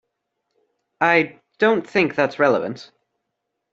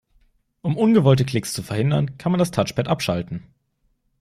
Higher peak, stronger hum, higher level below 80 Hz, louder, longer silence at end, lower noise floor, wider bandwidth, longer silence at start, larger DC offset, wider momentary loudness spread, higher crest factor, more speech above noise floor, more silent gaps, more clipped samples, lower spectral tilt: about the same, -2 dBFS vs -4 dBFS; neither; second, -66 dBFS vs -52 dBFS; about the same, -19 LUFS vs -21 LUFS; about the same, 0.9 s vs 0.8 s; first, -78 dBFS vs -68 dBFS; second, 7.8 kHz vs 15 kHz; first, 1 s vs 0.65 s; neither; about the same, 11 LU vs 11 LU; about the same, 20 dB vs 18 dB; first, 59 dB vs 48 dB; neither; neither; about the same, -6 dB/octave vs -6.5 dB/octave